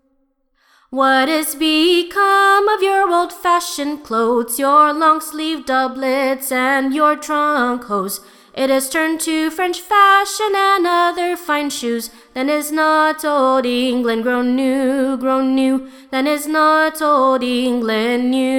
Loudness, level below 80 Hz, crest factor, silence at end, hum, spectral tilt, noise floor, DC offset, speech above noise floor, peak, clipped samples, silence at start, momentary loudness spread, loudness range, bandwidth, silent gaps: -16 LUFS; -58 dBFS; 16 dB; 0 s; none; -2.5 dB/octave; -63 dBFS; under 0.1%; 47 dB; 0 dBFS; under 0.1%; 0.9 s; 9 LU; 3 LU; 19.5 kHz; none